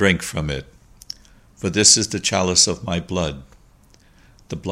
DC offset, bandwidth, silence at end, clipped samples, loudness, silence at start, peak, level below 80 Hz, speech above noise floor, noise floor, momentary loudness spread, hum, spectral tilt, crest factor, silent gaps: under 0.1%; 16 kHz; 0 s; under 0.1%; -18 LUFS; 0 s; 0 dBFS; -42 dBFS; 33 dB; -52 dBFS; 24 LU; none; -2.5 dB/octave; 22 dB; none